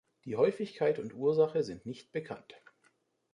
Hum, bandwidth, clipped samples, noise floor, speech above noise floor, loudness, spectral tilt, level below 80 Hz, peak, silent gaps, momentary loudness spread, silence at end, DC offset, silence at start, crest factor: none; 10 kHz; under 0.1%; -72 dBFS; 40 dB; -32 LUFS; -7 dB/octave; -72 dBFS; -14 dBFS; none; 14 LU; 0.8 s; under 0.1%; 0.25 s; 18 dB